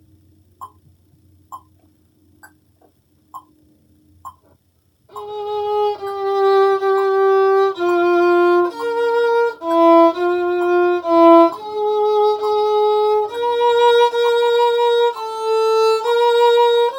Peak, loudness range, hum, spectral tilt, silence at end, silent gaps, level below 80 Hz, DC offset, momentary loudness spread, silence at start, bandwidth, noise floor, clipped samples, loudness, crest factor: 0 dBFS; 8 LU; none; -4 dB/octave; 0 s; none; -66 dBFS; under 0.1%; 8 LU; 0.6 s; 17 kHz; -60 dBFS; under 0.1%; -15 LUFS; 16 dB